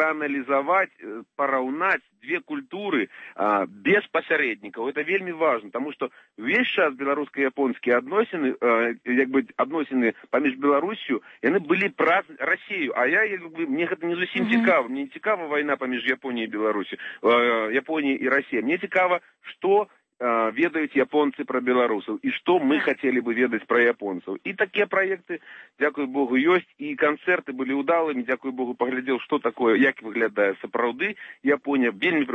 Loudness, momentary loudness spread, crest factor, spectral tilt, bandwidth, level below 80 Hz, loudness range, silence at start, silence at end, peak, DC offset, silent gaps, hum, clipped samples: -24 LUFS; 9 LU; 16 dB; -7 dB/octave; 6.4 kHz; -76 dBFS; 2 LU; 0 s; 0 s; -8 dBFS; under 0.1%; none; none; under 0.1%